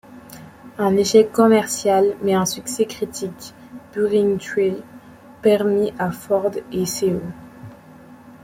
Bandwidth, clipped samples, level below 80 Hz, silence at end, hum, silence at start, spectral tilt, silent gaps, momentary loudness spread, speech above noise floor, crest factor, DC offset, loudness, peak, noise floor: 16.5 kHz; under 0.1%; -58 dBFS; 0.15 s; none; 0.1 s; -5 dB/octave; none; 23 LU; 25 dB; 18 dB; under 0.1%; -19 LUFS; -2 dBFS; -44 dBFS